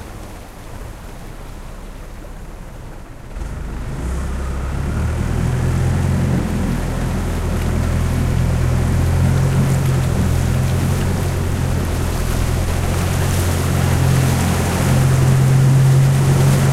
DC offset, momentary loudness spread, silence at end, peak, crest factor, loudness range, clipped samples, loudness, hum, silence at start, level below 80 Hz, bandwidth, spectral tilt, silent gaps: under 0.1%; 21 LU; 0 s; -2 dBFS; 14 dB; 15 LU; under 0.1%; -17 LUFS; none; 0 s; -26 dBFS; 15.5 kHz; -6.5 dB/octave; none